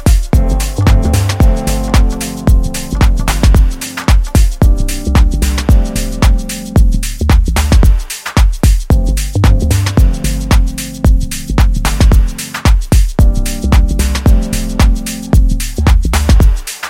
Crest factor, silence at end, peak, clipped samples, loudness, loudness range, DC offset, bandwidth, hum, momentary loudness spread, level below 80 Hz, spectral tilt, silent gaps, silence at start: 10 dB; 0 s; 0 dBFS; under 0.1%; -13 LUFS; 1 LU; under 0.1%; 16.5 kHz; none; 6 LU; -10 dBFS; -5.5 dB/octave; none; 0 s